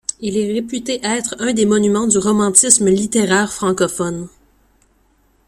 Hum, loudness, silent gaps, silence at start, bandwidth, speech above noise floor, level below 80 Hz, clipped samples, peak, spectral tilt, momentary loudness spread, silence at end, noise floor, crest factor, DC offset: none; -15 LUFS; none; 0.1 s; 16 kHz; 41 dB; -52 dBFS; under 0.1%; 0 dBFS; -3.5 dB/octave; 11 LU; 1.2 s; -57 dBFS; 16 dB; under 0.1%